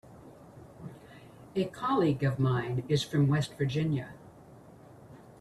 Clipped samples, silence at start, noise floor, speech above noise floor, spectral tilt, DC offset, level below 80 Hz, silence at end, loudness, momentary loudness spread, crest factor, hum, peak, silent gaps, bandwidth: under 0.1%; 0.1 s; -53 dBFS; 24 dB; -7 dB/octave; under 0.1%; -62 dBFS; 0.2 s; -30 LUFS; 25 LU; 16 dB; none; -16 dBFS; none; 12.5 kHz